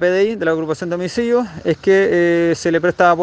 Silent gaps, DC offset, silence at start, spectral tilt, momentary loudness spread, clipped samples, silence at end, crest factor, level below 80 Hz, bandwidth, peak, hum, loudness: none; under 0.1%; 0 s; -6 dB/octave; 7 LU; under 0.1%; 0 s; 16 dB; -52 dBFS; 9.2 kHz; 0 dBFS; none; -16 LUFS